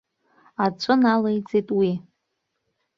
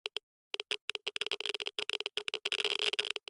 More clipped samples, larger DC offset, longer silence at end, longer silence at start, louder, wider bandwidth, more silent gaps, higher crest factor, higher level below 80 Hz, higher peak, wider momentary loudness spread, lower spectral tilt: neither; neither; first, 0.95 s vs 0.1 s; first, 0.6 s vs 0.05 s; first, -22 LUFS vs -35 LUFS; second, 7.2 kHz vs 11.5 kHz; second, none vs 0.23-0.51 s, 0.81-0.88 s; about the same, 20 dB vs 20 dB; first, -66 dBFS vs -84 dBFS; first, -4 dBFS vs -18 dBFS; about the same, 9 LU vs 10 LU; first, -7 dB/octave vs 1 dB/octave